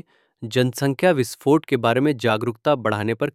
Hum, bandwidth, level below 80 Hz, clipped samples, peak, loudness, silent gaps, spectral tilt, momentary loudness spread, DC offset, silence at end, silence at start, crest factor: none; 16 kHz; -64 dBFS; under 0.1%; -4 dBFS; -21 LUFS; none; -6 dB/octave; 4 LU; under 0.1%; 0.05 s; 0.4 s; 18 dB